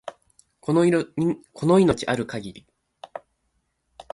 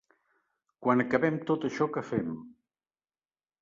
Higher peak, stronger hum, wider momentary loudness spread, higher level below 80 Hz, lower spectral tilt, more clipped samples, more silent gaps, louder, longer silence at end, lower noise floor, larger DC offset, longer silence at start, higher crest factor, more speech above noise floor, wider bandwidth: about the same, -8 dBFS vs -10 dBFS; neither; first, 22 LU vs 9 LU; first, -54 dBFS vs -68 dBFS; about the same, -6.5 dB/octave vs -7.5 dB/octave; neither; neither; first, -22 LUFS vs -29 LUFS; second, 0.95 s vs 1.1 s; second, -72 dBFS vs under -90 dBFS; neither; second, 0.05 s vs 0.8 s; about the same, 18 dB vs 22 dB; second, 51 dB vs over 61 dB; first, 11.5 kHz vs 7.4 kHz